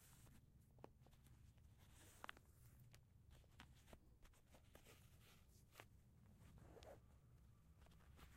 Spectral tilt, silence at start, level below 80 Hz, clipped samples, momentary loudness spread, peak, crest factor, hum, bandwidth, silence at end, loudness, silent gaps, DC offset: -4.5 dB/octave; 0 s; -74 dBFS; under 0.1%; 9 LU; -36 dBFS; 32 dB; none; 16 kHz; 0 s; -67 LUFS; none; under 0.1%